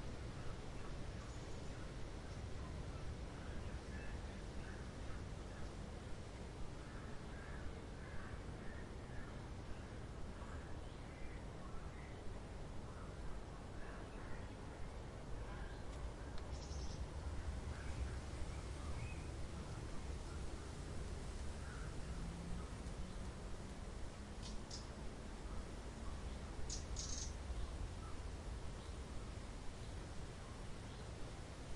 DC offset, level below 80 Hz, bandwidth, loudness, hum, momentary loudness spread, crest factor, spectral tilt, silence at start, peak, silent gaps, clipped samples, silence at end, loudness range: under 0.1%; -52 dBFS; 11.5 kHz; -51 LUFS; none; 4 LU; 16 dB; -5 dB/octave; 0 s; -30 dBFS; none; under 0.1%; 0 s; 4 LU